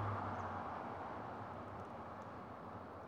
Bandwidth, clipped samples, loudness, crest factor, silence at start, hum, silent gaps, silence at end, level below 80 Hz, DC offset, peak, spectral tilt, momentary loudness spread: 9.6 kHz; under 0.1%; -47 LUFS; 16 dB; 0 s; none; none; 0 s; -70 dBFS; under 0.1%; -30 dBFS; -7.5 dB/octave; 8 LU